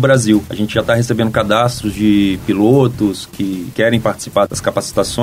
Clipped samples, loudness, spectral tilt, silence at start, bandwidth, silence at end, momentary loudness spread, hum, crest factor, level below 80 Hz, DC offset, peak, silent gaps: under 0.1%; -15 LUFS; -5.5 dB/octave; 0 s; 16 kHz; 0 s; 7 LU; none; 14 dB; -40 dBFS; under 0.1%; 0 dBFS; none